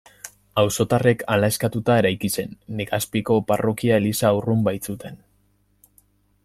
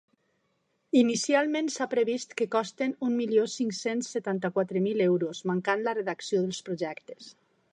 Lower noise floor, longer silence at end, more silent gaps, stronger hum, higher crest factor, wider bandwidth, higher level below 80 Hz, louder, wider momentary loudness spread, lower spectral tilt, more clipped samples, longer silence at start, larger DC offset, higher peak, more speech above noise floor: second, -63 dBFS vs -74 dBFS; first, 1.3 s vs 0.4 s; neither; first, 50 Hz at -45 dBFS vs none; about the same, 18 dB vs 18 dB; first, 16 kHz vs 10.5 kHz; first, -54 dBFS vs -80 dBFS; first, -21 LUFS vs -28 LUFS; first, 13 LU vs 8 LU; about the same, -5.5 dB/octave vs -5 dB/octave; neither; second, 0.25 s vs 0.95 s; neither; first, -4 dBFS vs -10 dBFS; second, 42 dB vs 46 dB